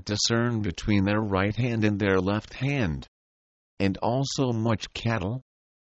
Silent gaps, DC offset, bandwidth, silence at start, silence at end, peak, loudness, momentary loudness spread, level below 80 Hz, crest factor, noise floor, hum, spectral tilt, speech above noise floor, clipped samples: 3.08-3.77 s; under 0.1%; 8.2 kHz; 0.05 s; 0.55 s; -10 dBFS; -26 LUFS; 6 LU; -48 dBFS; 18 dB; under -90 dBFS; none; -5.5 dB/octave; over 64 dB; under 0.1%